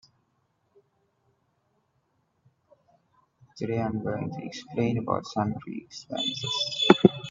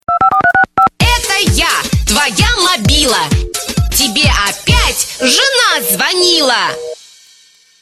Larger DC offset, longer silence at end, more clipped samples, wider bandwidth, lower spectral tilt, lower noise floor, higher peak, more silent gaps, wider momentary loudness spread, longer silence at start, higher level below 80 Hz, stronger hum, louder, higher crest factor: neither; second, 0 s vs 0.85 s; neither; second, 7.6 kHz vs 14 kHz; first, -5.5 dB/octave vs -2.5 dB/octave; first, -72 dBFS vs -46 dBFS; about the same, 0 dBFS vs 0 dBFS; neither; first, 17 LU vs 5 LU; first, 3.55 s vs 0.1 s; second, -66 dBFS vs -22 dBFS; neither; second, -27 LUFS vs -10 LUFS; first, 28 dB vs 12 dB